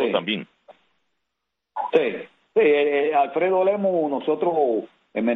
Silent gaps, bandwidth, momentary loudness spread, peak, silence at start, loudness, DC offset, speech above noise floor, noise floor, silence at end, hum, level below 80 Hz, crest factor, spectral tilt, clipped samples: none; 4 kHz; 11 LU; -4 dBFS; 0 s; -22 LUFS; under 0.1%; 60 dB; -81 dBFS; 0 s; none; -72 dBFS; 18 dB; -7.5 dB/octave; under 0.1%